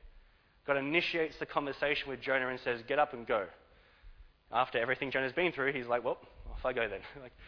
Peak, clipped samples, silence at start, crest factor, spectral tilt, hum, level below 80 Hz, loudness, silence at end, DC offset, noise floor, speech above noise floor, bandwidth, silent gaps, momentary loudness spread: -14 dBFS; under 0.1%; 0 s; 20 dB; -6 dB/octave; none; -56 dBFS; -33 LUFS; 0 s; under 0.1%; -62 dBFS; 28 dB; 5.4 kHz; none; 9 LU